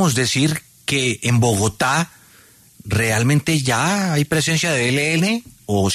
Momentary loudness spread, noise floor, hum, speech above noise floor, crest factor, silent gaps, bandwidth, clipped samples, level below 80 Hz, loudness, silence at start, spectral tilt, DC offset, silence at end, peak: 5 LU; -49 dBFS; none; 31 dB; 14 dB; none; 13.5 kHz; under 0.1%; -48 dBFS; -18 LUFS; 0 s; -4.5 dB/octave; under 0.1%; 0 s; -6 dBFS